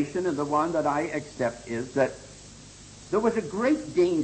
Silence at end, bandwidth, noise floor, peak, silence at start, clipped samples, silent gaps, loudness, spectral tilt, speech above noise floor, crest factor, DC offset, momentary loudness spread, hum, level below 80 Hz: 0 s; 8.8 kHz; -47 dBFS; -12 dBFS; 0 s; under 0.1%; none; -27 LUFS; -6 dB/octave; 21 dB; 16 dB; under 0.1%; 21 LU; 50 Hz at -55 dBFS; -56 dBFS